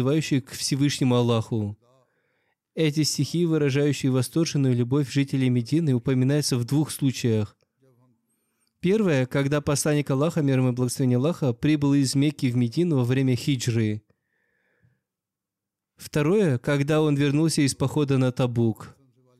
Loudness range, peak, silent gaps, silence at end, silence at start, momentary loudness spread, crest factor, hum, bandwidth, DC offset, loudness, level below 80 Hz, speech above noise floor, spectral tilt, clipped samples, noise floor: 4 LU; -12 dBFS; none; 0.5 s; 0 s; 5 LU; 12 dB; none; 14.5 kHz; under 0.1%; -23 LUFS; -62 dBFS; 64 dB; -6 dB/octave; under 0.1%; -87 dBFS